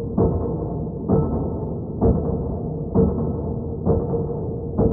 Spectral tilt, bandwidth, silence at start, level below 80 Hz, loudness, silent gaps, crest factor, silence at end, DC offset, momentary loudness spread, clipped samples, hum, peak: -16.5 dB/octave; 1.9 kHz; 0 s; -32 dBFS; -23 LUFS; none; 18 dB; 0 s; under 0.1%; 7 LU; under 0.1%; none; -4 dBFS